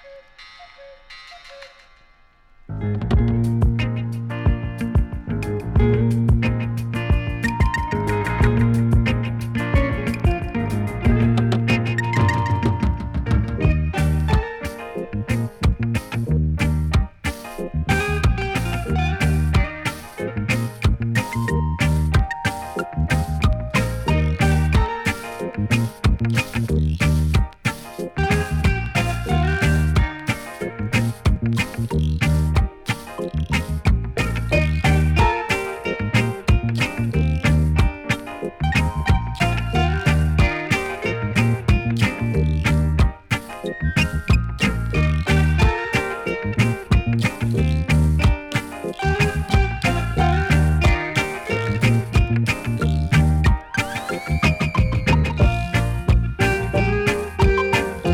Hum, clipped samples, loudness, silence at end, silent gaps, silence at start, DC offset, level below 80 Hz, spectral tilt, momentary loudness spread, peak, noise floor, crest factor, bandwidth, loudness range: none; under 0.1%; -21 LUFS; 0 s; none; 0.05 s; under 0.1%; -26 dBFS; -6.5 dB/octave; 8 LU; -6 dBFS; -52 dBFS; 14 dB; 15.5 kHz; 3 LU